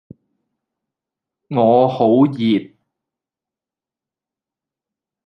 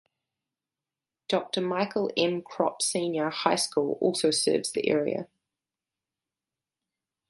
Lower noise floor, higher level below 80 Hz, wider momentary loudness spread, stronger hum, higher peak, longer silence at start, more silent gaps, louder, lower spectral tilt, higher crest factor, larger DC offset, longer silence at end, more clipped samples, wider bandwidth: about the same, -89 dBFS vs under -90 dBFS; first, -68 dBFS vs -76 dBFS; about the same, 7 LU vs 5 LU; neither; first, -2 dBFS vs -8 dBFS; first, 1.5 s vs 1.3 s; neither; first, -15 LUFS vs -27 LUFS; first, -9.5 dB/octave vs -3.5 dB/octave; about the same, 18 dB vs 22 dB; neither; first, 2.6 s vs 2.05 s; neither; second, 5.8 kHz vs 12 kHz